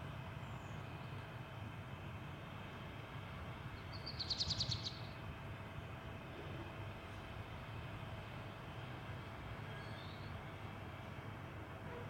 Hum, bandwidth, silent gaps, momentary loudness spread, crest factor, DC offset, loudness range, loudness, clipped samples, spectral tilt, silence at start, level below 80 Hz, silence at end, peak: none; 16.5 kHz; none; 9 LU; 20 dB; under 0.1%; 6 LU; -47 LUFS; under 0.1%; -4.5 dB/octave; 0 s; -62 dBFS; 0 s; -26 dBFS